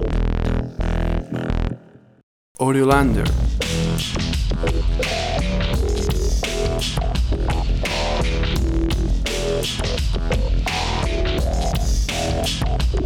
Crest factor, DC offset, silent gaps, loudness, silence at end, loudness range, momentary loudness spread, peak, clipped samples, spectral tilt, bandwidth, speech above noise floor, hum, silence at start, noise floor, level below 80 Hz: 18 dB; under 0.1%; 2.23-2.55 s; -22 LUFS; 0 s; 2 LU; 4 LU; -2 dBFS; under 0.1%; -5 dB/octave; 16 kHz; 23 dB; none; 0 s; -42 dBFS; -22 dBFS